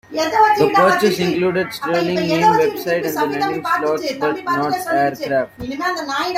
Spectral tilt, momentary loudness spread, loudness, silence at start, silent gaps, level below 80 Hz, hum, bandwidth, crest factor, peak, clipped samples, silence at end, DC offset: -5 dB/octave; 8 LU; -17 LUFS; 0.1 s; none; -54 dBFS; none; 16 kHz; 16 dB; -2 dBFS; under 0.1%; 0 s; under 0.1%